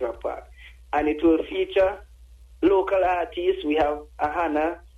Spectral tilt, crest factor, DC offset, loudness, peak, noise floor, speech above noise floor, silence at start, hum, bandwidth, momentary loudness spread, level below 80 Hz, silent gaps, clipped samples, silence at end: -6.5 dB/octave; 16 dB; under 0.1%; -24 LUFS; -8 dBFS; -48 dBFS; 26 dB; 0 s; none; 7.6 kHz; 9 LU; -46 dBFS; none; under 0.1%; 0.1 s